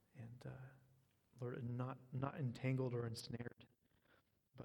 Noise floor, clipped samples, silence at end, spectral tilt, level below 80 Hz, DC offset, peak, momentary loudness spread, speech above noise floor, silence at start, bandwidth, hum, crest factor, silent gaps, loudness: -77 dBFS; under 0.1%; 0 s; -7 dB/octave; -78 dBFS; under 0.1%; -28 dBFS; 13 LU; 32 dB; 0.15 s; 13.5 kHz; none; 20 dB; none; -47 LUFS